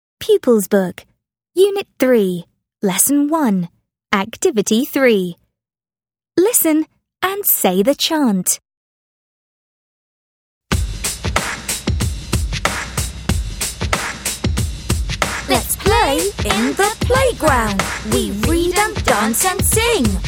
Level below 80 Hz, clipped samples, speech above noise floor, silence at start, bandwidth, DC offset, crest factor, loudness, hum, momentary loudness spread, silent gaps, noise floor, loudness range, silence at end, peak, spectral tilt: -30 dBFS; under 0.1%; over 74 dB; 0.2 s; over 20 kHz; under 0.1%; 18 dB; -17 LUFS; none; 8 LU; 8.77-10.61 s; under -90 dBFS; 6 LU; 0 s; 0 dBFS; -4 dB/octave